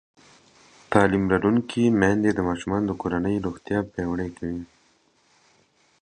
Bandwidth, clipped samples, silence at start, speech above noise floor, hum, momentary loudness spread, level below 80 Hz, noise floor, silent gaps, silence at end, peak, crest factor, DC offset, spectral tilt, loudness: 10 kHz; under 0.1%; 0.9 s; 40 dB; none; 10 LU; -48 dBFS; -63 dBFS; none; 1.35 s; -2 dBFS; 24 dB; under 0.1%; -7 dB/octave; -24 LUFS